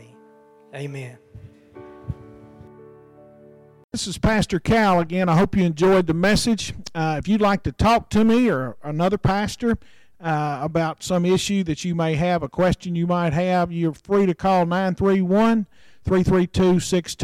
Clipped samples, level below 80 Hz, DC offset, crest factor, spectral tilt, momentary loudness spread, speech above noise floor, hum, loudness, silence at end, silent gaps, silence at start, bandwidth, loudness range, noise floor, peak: under 0.1%; -42 dBFS; under 0.1%; 10 dB; -6 dB/octave; 14 LU; 31 dB; none; -21 LUFS; 0 s; 3.84-3.89 s; 0 s; 14 kHz; 10 LU; -51 dBFS; -12 dBFS